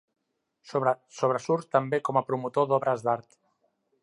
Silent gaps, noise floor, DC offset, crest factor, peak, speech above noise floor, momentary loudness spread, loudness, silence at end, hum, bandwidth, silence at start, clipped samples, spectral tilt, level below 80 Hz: none; -73 dBFS; under 0.1%; 20 dB; -8 dBFS; 46 dB; 4 LU; -27 LUFS; 0.8 s; none; 11.5 kHz; 0.65 s; under 0.1%; -6.5 dB/octave; -80 dBFS